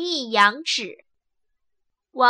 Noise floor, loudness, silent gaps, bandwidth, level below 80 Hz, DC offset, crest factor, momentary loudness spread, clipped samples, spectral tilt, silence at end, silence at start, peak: -76 dBFS; -20 LUFS; none; 15 kHz; -82 dBFS; under 0.1%; 20 dB; 18 LU; under 0.1%; -1.5 dB/octave; 0 s; 0 s; -4 dBFS